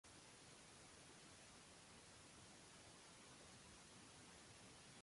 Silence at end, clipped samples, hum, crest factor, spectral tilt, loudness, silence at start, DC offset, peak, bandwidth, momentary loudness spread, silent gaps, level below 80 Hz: 0 s; under 0.1%; none; 12 dB; -2.5 dB/octave; -63 LUFS; 0.05 s; under 0.1%; -52 dBFS; 11.5 kHz; 1 LU; none; -80 dBFS